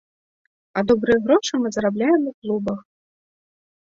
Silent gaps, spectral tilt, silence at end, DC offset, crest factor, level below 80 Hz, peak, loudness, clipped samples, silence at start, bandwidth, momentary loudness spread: 2.34-2.42 s; -5 dB/octave; 1.15 s; under 0.1%; 18 dB; -54 dBFS; -4 dBFS; -21 LUFS; under 0.1%; 0.75 s; 7.8 kHz; 10 LU